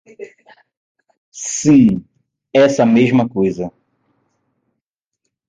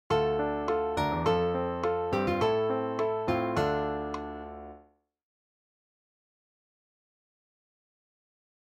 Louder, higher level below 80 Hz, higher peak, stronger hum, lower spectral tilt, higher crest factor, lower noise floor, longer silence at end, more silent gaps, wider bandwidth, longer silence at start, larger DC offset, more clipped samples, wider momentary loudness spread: first, -14 LUFS vs -29 LUFS; about the same, -52 dBFS vs -52 dBFS; first, -2 dBFS vs -14 dBFS; neither; about the same, -5.5 dB/octave vs -6.5 dB/octave; about the same, 16 dB vs 18 dB; first, -79 dBFS vs -61 dBFS; second, 1.8 s vs 3.9 s; first, 0.77-0.95 s, 1.17-1.32 s vs none; second, 9.4 kHz vs 14 kHz; about the same, 0.2 s vs 0.1 s; neither; neither; first, 21 LU vs 12 LU